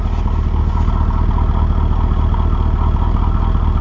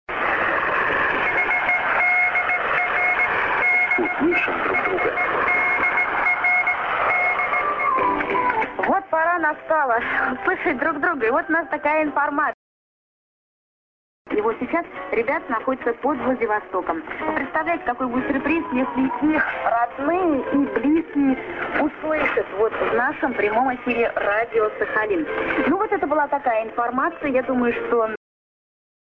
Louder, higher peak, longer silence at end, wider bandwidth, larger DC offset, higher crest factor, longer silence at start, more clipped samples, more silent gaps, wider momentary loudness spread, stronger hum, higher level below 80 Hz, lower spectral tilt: first, -17 LUFS vs -21 LUFS; first, -2 dBFS vs -6 dBFS; second, 0 s vs 1 s; second, 5.6 kHz vs 6.8 kHz; neither; second, 10 dB vs 16 dB; about the same, 0 s vs 0.1 s; neither; second, none vs 12.54-14.25 s; second, 1 LU vs 6 LU; neither; first, -14 dBFS vs -52 dBFS; first, -9.5 dB/octave vs -7 dB/octave